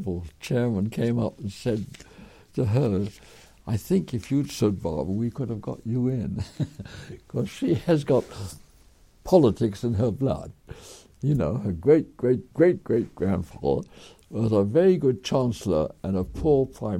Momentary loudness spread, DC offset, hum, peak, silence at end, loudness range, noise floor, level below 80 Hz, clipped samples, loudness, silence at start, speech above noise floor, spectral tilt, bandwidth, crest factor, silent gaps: 15 LU; under 0.1%; none; -6 dBFS; 0 s; 4 LU; -55 dBFS; -48 dBFS; under 0.1%; -25 LUFS; 0 s; 30 dB; -7.5 dB/octave; 16 kHz; 20 dB; none